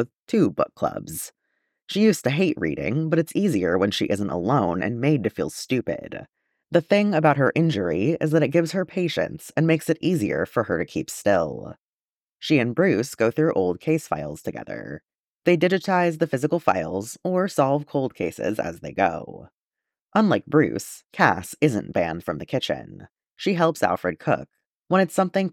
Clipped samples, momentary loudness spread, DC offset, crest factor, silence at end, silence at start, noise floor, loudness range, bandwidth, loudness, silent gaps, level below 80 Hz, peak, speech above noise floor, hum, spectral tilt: under 0.1%; 11 LU; under 0.1%; 22 dB; 0 s; 0 s; under -90 dBFS; 3 LU; 16.5 kHz; -23 LUFS; 0.19-0.26 s, 1.82-1.86 s, 11.78-12.36 s, 15.20-15.40 s, 19.60-19.71 s, 20.01-20.06 s, 24.66-24.76 s; -58 dBFS; -2 dBFS; over 67 dB; none; -6 dB/octave